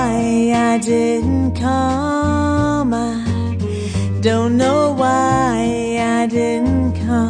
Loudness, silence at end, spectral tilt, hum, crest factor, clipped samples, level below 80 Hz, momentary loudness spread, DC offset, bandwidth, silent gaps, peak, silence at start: -17 LUFS; 0 s; -6.5 dB/octave; none; 14 dB; under 0.1%; -34 dBFS; 6 LU; under 0.1%; 10 kHz; none; -2 dBFS; 0 s